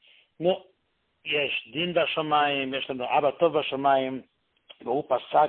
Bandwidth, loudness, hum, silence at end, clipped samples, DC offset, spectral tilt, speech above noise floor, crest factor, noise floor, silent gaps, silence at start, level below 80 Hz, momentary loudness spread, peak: 4.4 kHz; -26 LUFS; none; 0 s; under 0.1%; under 0.1%; -9 dB/octave; 48 dB; 18 dB; -74 dBFS; none; 0.4 s; -70 dBFS; 9 LU; -10 dBFS